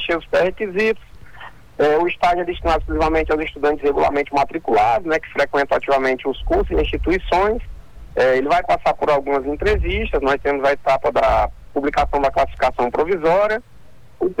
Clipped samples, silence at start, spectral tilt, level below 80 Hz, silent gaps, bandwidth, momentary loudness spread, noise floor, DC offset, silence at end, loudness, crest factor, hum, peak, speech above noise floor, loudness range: under 0.1%; 0 s; -6 dB/octave; -32 dBFS; none; 19 kHz; 5 LU; -40 dBFS; under 0.1%; 0.05 s; -19 LUFS; 10 dB; none; -10 dBFS; 22 dB; 1 LU